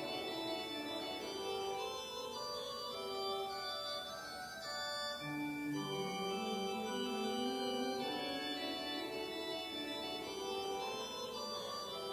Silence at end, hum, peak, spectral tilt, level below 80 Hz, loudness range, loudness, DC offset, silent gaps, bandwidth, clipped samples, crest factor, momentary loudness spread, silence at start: 0 s; none; -28 dBFS; -3 dB/octave; -72 dBFS; 2 LU; -41 LUFS; under 0.1%; none; 16 kHz; under 0.1%; 14 dB; 4 LU; 0 s